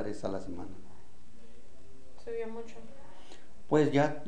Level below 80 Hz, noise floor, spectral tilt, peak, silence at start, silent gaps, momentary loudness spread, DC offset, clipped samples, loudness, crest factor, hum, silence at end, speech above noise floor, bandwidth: -58 dBFS; -58 dBFS; -7 dB/octave; -14 dBFS; 0 s; none; 27 LU; 2%; under 0.1%; -32 LUFS; 22 dB; none; 0 s; 26 dB; 10 kHz